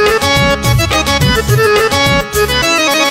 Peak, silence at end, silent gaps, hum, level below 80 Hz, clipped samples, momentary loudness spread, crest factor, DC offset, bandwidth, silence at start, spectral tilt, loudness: 0 dBFS; 0 s; none; none; -24 dBFS; under 0.1%; 2 LU; 10 dB; under 0.1%; 16.5 kHz; 0 s; -4 dB/octave; -10 LUFS